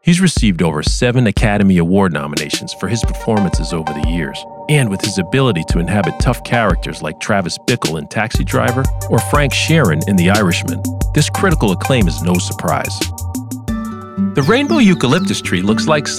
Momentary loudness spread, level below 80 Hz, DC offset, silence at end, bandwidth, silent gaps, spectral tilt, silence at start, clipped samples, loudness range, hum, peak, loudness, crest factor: 8 LU; -26 dBFS; under 0.1%; 0 s; 15.5 kHz; none; -5.5 dB/octave; 0.05 s; under 0.1%; 3 LU; none; -2 dBFS; -15 LUFS; 12 dB